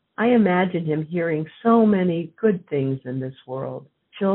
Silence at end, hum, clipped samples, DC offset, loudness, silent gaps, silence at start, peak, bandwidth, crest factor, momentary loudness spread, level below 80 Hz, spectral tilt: 0 s; none; under 0.1%; under 0.1%; -22 LUFS; none; 0.2 s; -6 dBFS; 4 kHz; 16 dB; 14 LU; -64 dBFS; -7 dB/octave